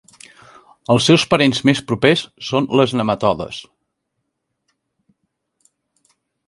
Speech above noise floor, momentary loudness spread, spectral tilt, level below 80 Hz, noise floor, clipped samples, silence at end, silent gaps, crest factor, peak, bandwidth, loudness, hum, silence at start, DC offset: 59 dB; 12 LU; -5 dB/octave; -52 dBFS; -75 dBFS; under 0.1%; 2.85 s; none; 20 dB; 0 dBFS; 11.5 kHz; -16 LUFS; none; 0.9 s; under 0.1%